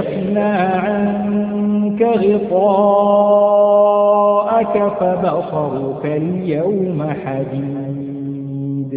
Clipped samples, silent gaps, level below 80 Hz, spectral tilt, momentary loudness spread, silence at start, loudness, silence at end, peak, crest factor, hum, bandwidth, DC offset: under 0.1%; none; -54 dBFS; -13 dB/octave; 11 LU; 0 s; -16 LUFS; 0 s; -2 dBFS; 14 dB; none; 4.5 kHz; under 0.1%